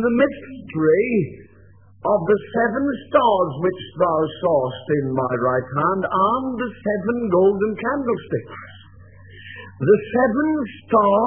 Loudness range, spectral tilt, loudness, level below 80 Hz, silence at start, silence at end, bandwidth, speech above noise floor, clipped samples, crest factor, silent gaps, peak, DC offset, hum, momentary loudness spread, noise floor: 2 LU; -11 dB/octave; -20 LUFS; -56 dBFS; 0 s; 0 s; 3.5 kHz; 30 dB; under 0.1%; 18 dB; none; -2 dBFS; 0.2%; none; 11 LU; -49 dBFS